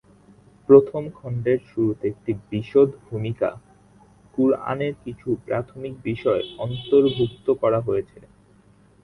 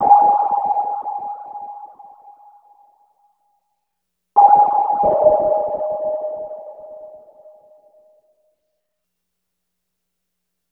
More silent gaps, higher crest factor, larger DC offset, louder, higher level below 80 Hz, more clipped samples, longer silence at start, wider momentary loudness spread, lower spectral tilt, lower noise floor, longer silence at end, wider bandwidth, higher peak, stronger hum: neither; about the same, 22 dB vs 20 dB; neither; second, -22 LUFS vs -16 LUFS; about the same, -54 dBFS vs -58 dBFS; neither; first, 0.7 s vs 0 s; second, 14 LU vs 24 LU; about the same, -9 dB/octave vs -9.5 dB/octave; second, -55 dBFS vs -78 dBFS; second, 1 s vs 3.55 s; first, 4.4 kHz vs 2.6 kHz; about the same, -2 dBFS vs 0 dBFS; first, 50 Hz at -50 dBFS vs none